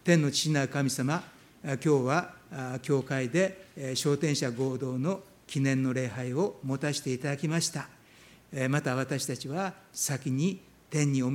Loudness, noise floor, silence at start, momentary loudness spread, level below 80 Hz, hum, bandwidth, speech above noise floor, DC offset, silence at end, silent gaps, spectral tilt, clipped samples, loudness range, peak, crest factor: -30 LUFS; -56 dBFS; 0.05 s; 10 LU; -70 dBFS; none; 16.5 kHz; 27 dB; under 0.1%; 0 s; none; -5 dB/octave; under 0.1%; 2 LU; -8 dBFS; 22 dB